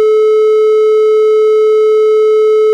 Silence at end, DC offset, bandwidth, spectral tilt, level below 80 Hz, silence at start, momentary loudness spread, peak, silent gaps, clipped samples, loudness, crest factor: 0 s; under 0.1%; 7.8 kHz; -2 dB/octave; -88 dBFS; 0 s; 0 LU; -4 dBFS; none; under 0.1%; -9 LUFS; 4 dB